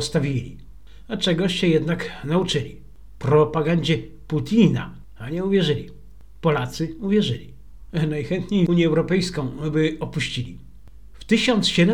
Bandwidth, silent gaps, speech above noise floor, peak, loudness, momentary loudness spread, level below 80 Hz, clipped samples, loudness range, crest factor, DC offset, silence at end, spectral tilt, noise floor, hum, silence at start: 12 kHz; none; 25 dB; -4 dBFS; -22 LUFS; 12 LU; -46 dBFS; under 0.1%; 3 LU; 18 dB; 0.8%; 0 s; -6 dB/octave; -46 dBFS; none; 0 s